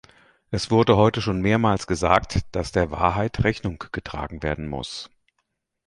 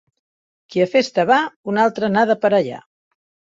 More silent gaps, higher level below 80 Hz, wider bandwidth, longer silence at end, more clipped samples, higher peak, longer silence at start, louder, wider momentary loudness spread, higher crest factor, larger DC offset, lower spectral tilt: second, none vs 1.56-1.64 s; first, -40 dBFS vs -64 dBFS; first, 11.5 kHz vs 7.8 kHz; about the same, 0.8 s vs 0.7 s; neither; about the same, -2 dBFS vs -2 dBFS; second, 0.5 s vs 0.7 s; second, -23 LUFS vs -18 LUFS; first, 13 LU vs 9 LU; about the same, 20 dB vs 18 dB; neither; about the same, -6 dB/octave vs -5.5 dB/octave